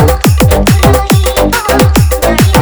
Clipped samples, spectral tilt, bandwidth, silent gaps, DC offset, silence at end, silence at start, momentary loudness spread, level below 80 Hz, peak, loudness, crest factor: 1%; -5.5 dB/octave; over 20 kHz; none; under 0.1%; 0 s; 0 s; 2 LU; -14 dBFS; 0 dBFS; -8 LUFS; 8 dB